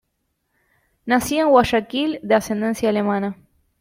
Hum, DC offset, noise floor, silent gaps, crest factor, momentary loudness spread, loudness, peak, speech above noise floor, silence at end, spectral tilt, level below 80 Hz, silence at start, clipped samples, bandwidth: none; under 0.1%; -73 dBFS; none; 18 dB; 9 LU; -19 LUFS; -2 dBFS; 54 dB; 0.5 s; -5 dB/octave; -50 dBFS; 1.05 s; under 0.1%; 16.5 kHz